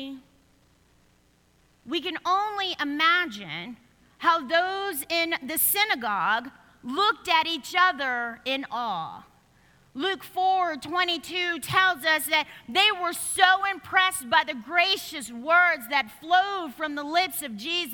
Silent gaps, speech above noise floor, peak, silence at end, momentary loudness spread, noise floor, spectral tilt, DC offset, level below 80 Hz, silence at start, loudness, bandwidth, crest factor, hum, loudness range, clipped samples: none; 37 dB; -2 dBFS; 0 s; 10 LU; -63 dBFS; -1.5 dB/octave; under 0.1%; -66 dBFS; 0 s; -24 LUFS; 19 kHz; 24 dB; none; 5 LU; under 0.1%